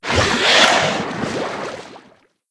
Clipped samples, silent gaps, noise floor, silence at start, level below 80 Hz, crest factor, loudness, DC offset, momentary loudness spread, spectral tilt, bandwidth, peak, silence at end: under 0.1%; none; -52 dBFS; 0 s; -42 dBFS; 18 dB; -15 LUFS; under 0.1%; 17 LU; -2.5 dB/octave; 11 kHz; 0 dBFS; 0.55 s